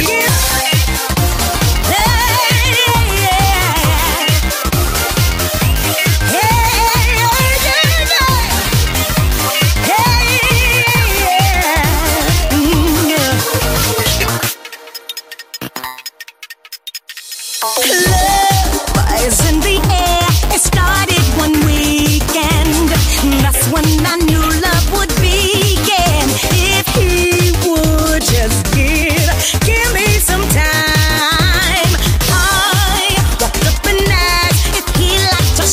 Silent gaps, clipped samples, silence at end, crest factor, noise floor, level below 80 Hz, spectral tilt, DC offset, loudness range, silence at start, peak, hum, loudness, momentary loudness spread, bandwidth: none; under 0.1%; 0 s; 12 dB; -35 dBFS; -18 dBFS; -3.5 dB/octave; under 0.1%; 3 LU; 0 s; 0 dBFS; none; -12 LUFS; 4 LU; 16.5 kHz